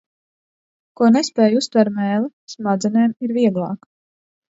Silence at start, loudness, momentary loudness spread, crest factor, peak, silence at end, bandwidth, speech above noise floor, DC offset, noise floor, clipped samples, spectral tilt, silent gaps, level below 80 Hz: 1 s; -18 LUFS; 12 LU; 18 dB; -2 dBFS; 0.85 s; 8 kHz; over 73 dB; under 0.1%; under -90 dBFS; under 0.1%; -6 dB/octave; 2.33-2.47 s; -68 dBFS